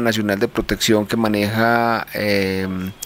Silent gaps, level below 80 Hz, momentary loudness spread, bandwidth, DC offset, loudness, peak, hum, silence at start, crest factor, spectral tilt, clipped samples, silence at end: none; -42 dBFS; 5 LU; 16 kHz; under 0.1%; -19 LUFS; -4 dBFS; none; 0 s; 14 dB; -4.5 dB/octave; under 0.1%; 0 s